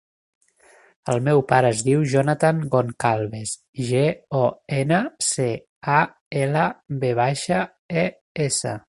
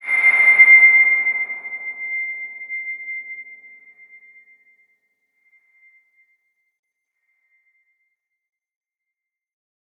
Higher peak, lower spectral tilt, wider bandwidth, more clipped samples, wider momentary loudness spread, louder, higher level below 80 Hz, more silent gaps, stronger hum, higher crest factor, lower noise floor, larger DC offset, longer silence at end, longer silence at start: about the same, -2 dBFS vs -2 dBFS; first, -5 dB/octave vs -1 dB/octave; about the same, 11.5 kHz vs 11 kHz; neither; second, 8 LU vs 22 LU; second, -22 LUFS vs -13 LUFS; first, -58 dBFS vs under -90 dBFS; first, 3.68-3.73 s, 5.69-5.81 s, 6.21-6.31 s, 7.79-7.89 s, 8.21-8.35 s vs none; neither; about the same, 20 dB vs 20 dB; second, -54 dBFS vs -85 dBFS; neither; second, 0.1 s vs 6.45 s; first, 1.05 s vs 0.05 s